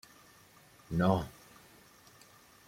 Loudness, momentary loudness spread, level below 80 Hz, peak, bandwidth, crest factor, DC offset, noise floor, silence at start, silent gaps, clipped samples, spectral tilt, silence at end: -33 LUFS; 27 LU; -60 dBFS; -12 dBFS; 16.5 kHz; 24 dB; under 0.1%; -60 dBFS; 0.9 s; none; under 0.1%; -7.5 dB/octave; 1.4 s